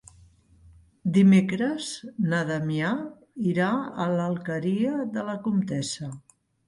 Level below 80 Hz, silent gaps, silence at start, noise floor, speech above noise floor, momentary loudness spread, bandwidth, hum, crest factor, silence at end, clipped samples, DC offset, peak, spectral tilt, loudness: -62 dBFS; none; 1.05 s; -56 dBFS; 31 dB; 13 LU; 11.5 kHz; none; 16 dB; 0.5 s; under 0.1%; under 0.1%; -10 dBFS; -6.5 dB/octave; -26 LUFS